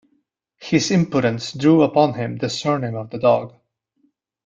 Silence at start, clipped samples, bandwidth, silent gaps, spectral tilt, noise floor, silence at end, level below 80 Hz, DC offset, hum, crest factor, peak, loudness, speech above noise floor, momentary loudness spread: 0.6 s; under 0.1%; 7.8 kHz; none; -6 dB/octave; -67 dBFS; 1 s; -58 dBFS; under 0.1%; none; 18 dB; -2 dBFS; -19 LUFS; 49 dB; 10 LU